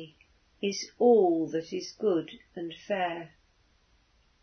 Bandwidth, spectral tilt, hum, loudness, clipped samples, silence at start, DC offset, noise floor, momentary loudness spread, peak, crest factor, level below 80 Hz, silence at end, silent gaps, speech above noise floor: 6.6 kHz; -5 dB/octave; none; -29 LUFS; under 0.1%; 0 s; under 0.1%; -67 dBFS; 18 LU; -12 dBFS; 20 dB; -70 dBFS; 1.15 s; none; 39 dB